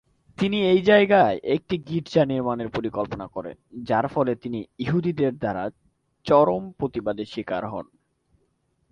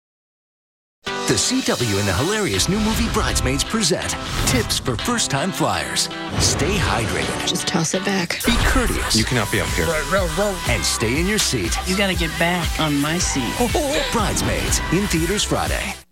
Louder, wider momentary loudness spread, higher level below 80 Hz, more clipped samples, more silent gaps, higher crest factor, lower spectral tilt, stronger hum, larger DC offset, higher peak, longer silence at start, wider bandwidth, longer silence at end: second, -23 LUFS vs -19 LUFS; first, 16 LU vs 3 LU; second, -56 dBFS vs -30 dBFS; neither; neither; about the same, 20 dB vs 18 dB; first, -7.5 dB/octave vs -3.5 dB/octave; neither; second, under 0.1% vs 0.1%; about the same, -4 dBFS vs -4 dBFS; second, 0.4 s vs 1.05 s; second, 8.8 kHz vs 17 kHz; first, 1.1 s vs 0.1 s